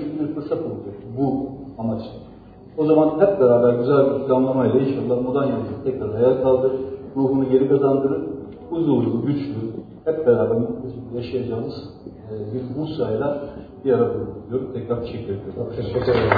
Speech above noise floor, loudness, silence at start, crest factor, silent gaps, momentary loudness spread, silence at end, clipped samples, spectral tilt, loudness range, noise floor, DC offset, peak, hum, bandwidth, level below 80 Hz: 23 dB; -21 LUFS; 0 s; 20 dB; none; 14 LU; 0 s; under 0.1%; -11 dB/octave; 7 LU; -43 dBFS; under 0.1%; -2 dBFS; none; 5 kHz; -50 dBFS